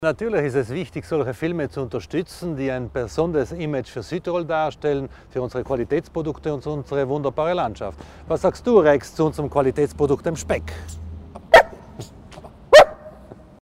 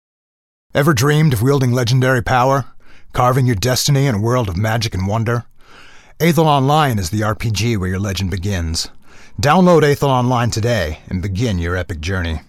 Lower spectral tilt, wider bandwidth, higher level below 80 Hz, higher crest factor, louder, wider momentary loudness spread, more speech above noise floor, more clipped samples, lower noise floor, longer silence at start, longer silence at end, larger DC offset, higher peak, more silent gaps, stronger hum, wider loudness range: about the same, -5.5 dB/octave vs -5.5 dB/octave; about the same, 16 kHz vs 16 kHz; second, -44 dBFS vs -36 dBFS; about the same, 18 dB vs 14 dB; second, -21 LUFS vs -16 LUFS; first, 19 LU vs 9 LU; second, 20 dB vs 25 dB; neither; about the same, -43 dBFS vs -40 dBFS; second, 0 s vs 0.75 s; first, 0.4 s vs 0.1 s; neither; about the same, -2 dBFS vs -2 dBFS; neither; neither; first, 8 LU vs 2 LU